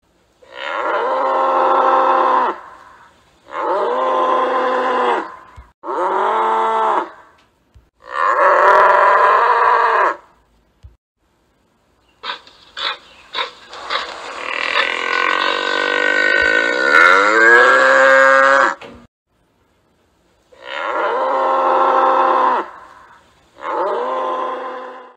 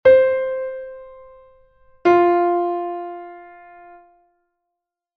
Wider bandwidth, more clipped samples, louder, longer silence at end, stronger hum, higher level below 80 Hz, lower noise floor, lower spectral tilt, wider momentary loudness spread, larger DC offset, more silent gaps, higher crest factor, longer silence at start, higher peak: first, 9.8 kHz vs 6.2 kHz; neither; first, -14 LUFS vs -18 LUFS; second, 0.15 s vs 1.7 s; neither; about the same, -56 dBFS vs -58 dBFS; second, -60 dBFS vs -82 dBFS; second, -2 dB/octave vs -7 dB/octave; second, 19 LU vs 23 LU; neither; first, 5.74-5.82 s, 10.98-11.15 s, 19.08-19.26 s vs none; about the same, 16 dB vs 18 dB; first, 0.5 s vs 0.05 s; about the same, 0 dBFS vs -2 dBFS